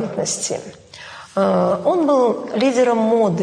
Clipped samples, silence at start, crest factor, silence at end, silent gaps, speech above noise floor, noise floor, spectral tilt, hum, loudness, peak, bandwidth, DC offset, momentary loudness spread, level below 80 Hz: under 0.1%; 0 s; 12 dB; 0 s; none; 21 dB; -38 dBFS; -5 dB/octave; none; -18 LUFS; -6 dBFS; 10.5 kHz; under 0.1%; 20 LU; -60 dBFS